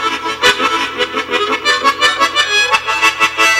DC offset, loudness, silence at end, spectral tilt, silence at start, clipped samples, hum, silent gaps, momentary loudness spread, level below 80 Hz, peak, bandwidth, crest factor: under 0.1%; -12 LUFS; 0 s; -0.5 dB/octave; 0 s; under 0.1%; none; none; 5 LU; -48 dBFS; 0 dBFS; 16.5 kHz; 14 dB